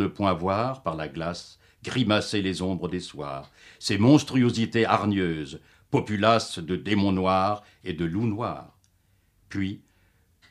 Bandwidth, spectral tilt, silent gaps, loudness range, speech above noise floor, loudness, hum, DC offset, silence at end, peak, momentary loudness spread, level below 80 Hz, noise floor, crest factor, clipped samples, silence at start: 12.5 kHz; -6 dB/octave; none; 6 LU; 40 dB; -26 LUFS; none; under 0.1%; 0.75 s; -4 dBFS; 14 LU; -56 dBFS; -65 dBFS; 22 dB; under 0.1%; 0 s